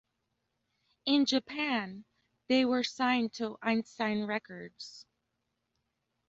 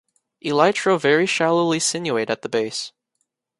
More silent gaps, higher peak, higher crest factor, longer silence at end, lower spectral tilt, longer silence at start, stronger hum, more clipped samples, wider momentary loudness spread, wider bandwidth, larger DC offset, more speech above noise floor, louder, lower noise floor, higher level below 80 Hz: neither; second, -16 dBFS vs -2 dBFS; about the same, 18 dB vs 20 dB; first, 1.3 s vs 0.7 s; about the same, -4 dB/octave vs -3.5 dB/octave; first, 1.05 s vs 0.45 s; neither; neither; first, 18 LU vs 10 LU; second, 7.8 kHz vs 11.5 kHz; neither; second, 51 dB vs 55 dB; second, -31 LUFS vs -20 LUFS; first, -83 dBFS vs -74 dBFS; second, -74 dBFS vs -68 dBFS